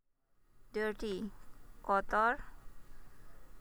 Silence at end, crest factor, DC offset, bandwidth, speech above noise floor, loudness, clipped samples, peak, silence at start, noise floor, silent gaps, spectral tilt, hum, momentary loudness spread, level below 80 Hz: 0 s; 20 dB; under 0.1%; over 20 kHz; 37 dB; -36 LUFS; under 0.1%; -18 dBFS; 0.55 s; -71 dBFS; none; -5.5 dB/octave; none; 16 LU; -54 dBFS